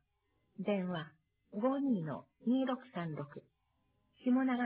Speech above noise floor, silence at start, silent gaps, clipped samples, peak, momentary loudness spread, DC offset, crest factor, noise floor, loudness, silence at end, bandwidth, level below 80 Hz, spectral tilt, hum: 44 dB; 0.6 s; none; under 0.1%; -24 dBFS; 14 LU; under 0.1%; 14 dB; -79 dBFS; -37 LUFS; 0 s; 4 kHz; -80 dBFS; -6 dB/octave; none